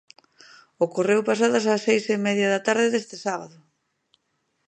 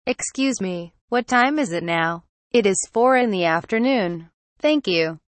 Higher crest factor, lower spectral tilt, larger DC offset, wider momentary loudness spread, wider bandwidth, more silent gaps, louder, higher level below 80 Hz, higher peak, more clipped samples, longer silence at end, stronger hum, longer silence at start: about the same, 18 dB vs 16 dB; about the same, -4.5 dB/octave vs -4 dB/octave; neither; about the same, 9 LU vs 9 LU; about the same, 9.4 kHz vs 8.8 kHz; second, none vs 1.01-1.08 s, 2.29-2.51 s, 4.34-4.56 s; second, -23 LUFS vs -20 LUFS; second, -78 dBFS vs -60 dBFS; about the same, -6 dBFS vs -6 dBFS; neither; first, 1.2 s vs 0.15 s; neither; first, 0.8 s vs 0.05 s